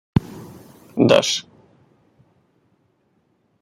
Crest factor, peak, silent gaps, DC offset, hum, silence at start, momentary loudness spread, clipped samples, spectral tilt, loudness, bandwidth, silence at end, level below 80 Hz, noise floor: 22 dB; -2 dBFS; none; under 0.1%; none; 0.15 s; 24 LU; under 0.1%; -4.5 dB/octave; -19 LUFS; 16 kHz; 2.2 s; -48 dBFS; -65 dBFS